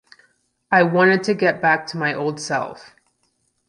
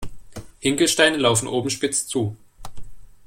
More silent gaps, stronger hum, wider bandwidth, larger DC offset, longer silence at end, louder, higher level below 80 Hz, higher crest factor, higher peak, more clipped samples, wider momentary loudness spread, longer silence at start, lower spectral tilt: neither; neither; second, 11.5 kHz vs 16.5 kHz; neither; first, 0.85 s vs 0.1 s; about the same, -19 LUFS vs -20 LUFS; second, -66 dBFS vs -46 dBFS; about the same, 18 dB vs 20 dB; about the same, -2 dBFS vs -2 dBFS; neither; second, 10 LU vs 24 LU; first, 0.7 s vs 0 s; first, -5.5 dB/octave vs -3 dB/octave